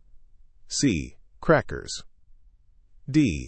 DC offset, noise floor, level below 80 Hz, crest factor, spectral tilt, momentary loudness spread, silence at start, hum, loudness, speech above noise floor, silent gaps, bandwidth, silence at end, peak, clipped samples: under 0.1%; -55 dBFS; -44 dBFS; 24 dB; -5 dB/octave; 15 LU; 0.15 s; none; -26 LUFS; 32 dB; none; 8.8 kHz; 0 s; -4 dBFS; under 0.1%